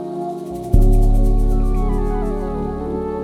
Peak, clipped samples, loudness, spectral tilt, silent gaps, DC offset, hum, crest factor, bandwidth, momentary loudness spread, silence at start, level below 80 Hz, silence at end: 0 dBFS; under 0.1%; -20 LUFS; -9 dB/octave; none; under 0.1%; none; 16 dB; 2.6 kHz; 9 LU; 0 s; -16 dBFS; 0 s